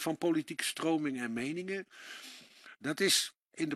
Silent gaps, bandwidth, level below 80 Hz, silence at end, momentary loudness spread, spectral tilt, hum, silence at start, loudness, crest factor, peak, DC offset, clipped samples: 3.37-3.46 s; 14.5 kHz; -80 dBFS; 0 s; 19 LU; -3 dB/octave; none; 0 s; -33 LUFS; 22 dB; -14 dBFS; under 0.1%; under 0.1%